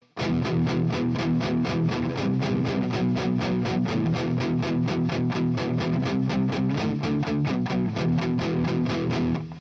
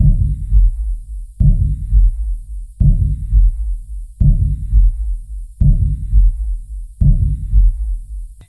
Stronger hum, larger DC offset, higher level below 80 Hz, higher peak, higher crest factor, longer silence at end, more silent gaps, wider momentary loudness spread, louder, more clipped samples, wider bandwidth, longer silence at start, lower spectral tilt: neither; neither; second, -52 dBFS vs -14 dBFS; second, -14 dBFS vs 0 dBFS; about the same, 10 dB vs 12 dB; second, 0 s vs 0.15 s; neither; second, 1 LU vs 14 LU; second, -25 LUFS vs -17 LUFS; neither; first, 7.6 kHz vs 0.7 kHz; first, 0.15 s vs 0 s; second, -7.5 dB/octave vs -11 dB/octave